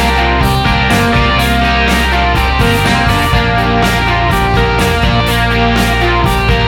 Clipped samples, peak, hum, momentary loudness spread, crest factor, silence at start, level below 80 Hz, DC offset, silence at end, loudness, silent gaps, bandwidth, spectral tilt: under 0.1%; 0 dBFS; none; 1 LU; 10 dB; 0 s; -18 dBFS; under 0.1%; 0 s; -11 LUFS; none; 17 kHz; -5 dB/octave